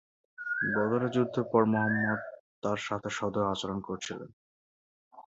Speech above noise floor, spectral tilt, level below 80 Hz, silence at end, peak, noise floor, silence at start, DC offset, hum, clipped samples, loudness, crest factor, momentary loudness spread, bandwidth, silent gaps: over 60 dB; -5.5 dB/octave; -64 dBFS; 0.15 s; -12 dBFS; under -90 dBFS; 0.4 s; under 0.1%; none; under 0.1%; -30 LUFS; 20 dB; 13 LU; 8 kHz; 2.40-2.62 s, 4.33-5.11 s